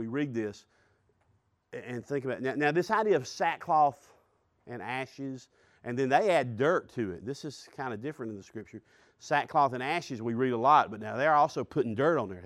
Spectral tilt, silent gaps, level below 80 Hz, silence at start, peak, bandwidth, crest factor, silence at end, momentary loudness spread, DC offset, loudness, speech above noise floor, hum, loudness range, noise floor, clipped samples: -6 dB/octave; none; -72 dBFS; 0 s; -10 dBFS; 13 kHz; 20 dB; 0 s; 17 LU; under 0.1%; -29 LUFS; 42 dB; none; 5 LU; -71 dBFS; under 0.1%